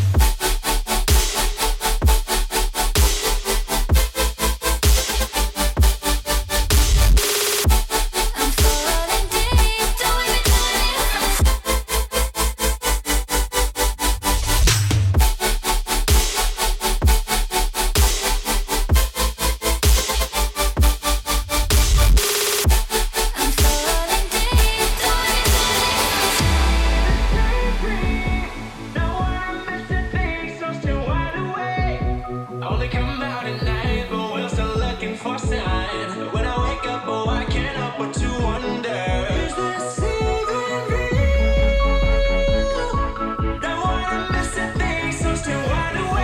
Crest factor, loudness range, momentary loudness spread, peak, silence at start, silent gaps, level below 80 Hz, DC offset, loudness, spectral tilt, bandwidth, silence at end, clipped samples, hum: 14 dB; 6 LU; 7 LU; -4 dBFS; 0 s; none; -22 dBFS; under 0.1%; -20 LUFS; -3.5 dB/octave; 17 kHz; 0 s; under 0.1%; none